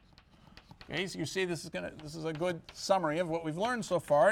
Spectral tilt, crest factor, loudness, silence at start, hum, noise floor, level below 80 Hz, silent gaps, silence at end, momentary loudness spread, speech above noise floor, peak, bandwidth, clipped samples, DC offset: -4.5 dB/octave; 18 dB; -34 LUFS; 0.55 s; none; -60 dBFS; -64 dBFS; none; 0 s; 11 LU; 28 dB; -14 dBFS; 16.5 kHz; under 0.1%; under 0.1%